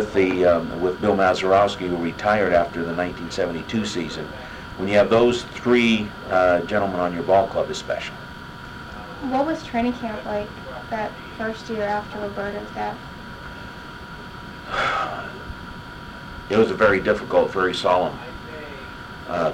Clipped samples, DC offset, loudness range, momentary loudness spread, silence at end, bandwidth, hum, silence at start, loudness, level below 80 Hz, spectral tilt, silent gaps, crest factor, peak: under 0.1%; under 0.1%; 9 LU; 19 LU; 0 s; 16 kHz; none; 0 s; -22 LUFS; -46 dBFS; -5.5 dB/octave; none; 18 dB; -6 dBFS